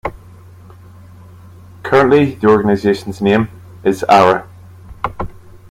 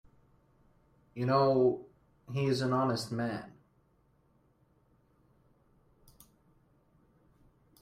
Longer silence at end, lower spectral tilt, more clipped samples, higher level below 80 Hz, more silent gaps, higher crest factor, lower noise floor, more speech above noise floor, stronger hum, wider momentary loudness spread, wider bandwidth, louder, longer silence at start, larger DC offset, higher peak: second, 0.15 s vs 4.3 s; about the same, -6.5 dB/octave vs -7 dB/octave; neither; first, -42 dBFS vs -70 dBFS; neither; second, 16 dB vs 22 dB; second, -39 dBFS vs -69 dBFS; second, 27 dB vs 40 dB; neither; about the same, 16 LU vs 16 LU; about the same, 15 kHz vs 15 kHz; first, -14 LUFS vs -31 LUFS; second, 0.05 s vs 1.15 s; neither; first, 0 dBFS vs -14 dBFS